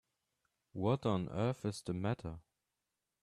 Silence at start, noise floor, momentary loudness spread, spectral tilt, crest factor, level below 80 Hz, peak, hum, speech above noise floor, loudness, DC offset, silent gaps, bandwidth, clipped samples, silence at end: 0.75 s; -89 dBFS; 14 LU; -7 dB/octave; 20 dB; -66 dBFS; -20 dBFS; none; 52 dB; -38 LUFS; under 0.1%; none; 12.5 kHz; under 0.1%; 0.8 s